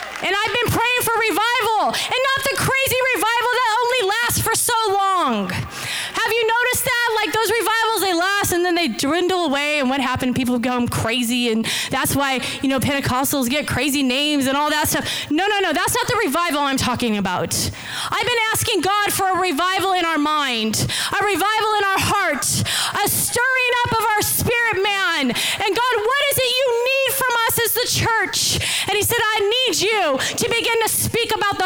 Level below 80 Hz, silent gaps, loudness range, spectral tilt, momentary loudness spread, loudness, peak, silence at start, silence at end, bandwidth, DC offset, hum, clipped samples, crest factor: -46 dBFS; none; 2 LU; -2.5 dB/octave; 3 LU; -18 LUFS; -10 dBFS; 0 s; 0 s; over 20 kHz; under 0.1%; none; under 0.1%; 8 dB